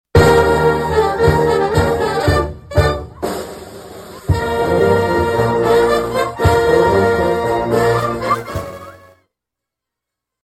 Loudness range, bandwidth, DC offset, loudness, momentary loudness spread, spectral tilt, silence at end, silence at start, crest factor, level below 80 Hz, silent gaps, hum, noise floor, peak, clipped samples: 4 LU; 14.5 kHz; under 0.1%; -15 LUFS; 14 LU; -6 dB/octave; 1.55 s; 0.15 s; 14 dB; -30 dBFS; none; none; -82 dBFS; 0 dBFS; under 0.1%